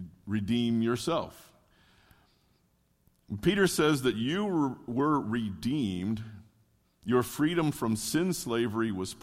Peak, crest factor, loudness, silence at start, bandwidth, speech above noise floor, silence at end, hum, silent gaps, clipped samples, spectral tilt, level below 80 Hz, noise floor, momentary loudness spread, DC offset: -12 dBFS; 18 dB; -29 LUFS; 0 s; 16.5 kHz; 41 dB; 0 s; none; none; under 0.1%; -5.5 dB/octave; -58 dBFS; -70 dBFS; 9 LU; under 0.1%